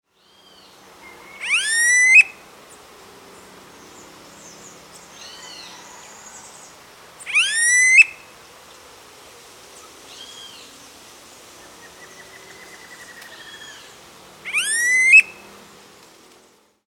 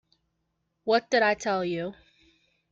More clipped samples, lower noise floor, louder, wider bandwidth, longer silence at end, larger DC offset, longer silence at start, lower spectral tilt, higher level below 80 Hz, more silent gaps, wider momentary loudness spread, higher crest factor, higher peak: neither; second, -55 dBFS vs -78 dBFS; first, -13 LUFS vs -26 LUFS; first, 19 kHz vs 7.8 kHz; first, 1.55 s vs 0.8 s; neither; first, 1.4 s vs 0.85 s; second, 2 dB/octave vs -4 dB/octave; about the same, -68 dBFS vs -68 dBFS; neither; first, 29 LU vs 13 LU; about the same, 22 dB vs 20 dB; first, 0 dBFS vs -10 dBFS